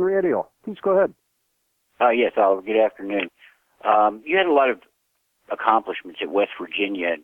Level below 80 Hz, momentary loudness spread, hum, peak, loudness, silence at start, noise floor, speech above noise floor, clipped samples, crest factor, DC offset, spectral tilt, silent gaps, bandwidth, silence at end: -68 dBFS; 10 LU; none; -2 dBFS; -21 LUFS; 0 s; -71 dBFS; 51 dB; under 0.1%; 20 dB; under 0.1%; -7 dB/octave; none; 4 kHz; 0.05 s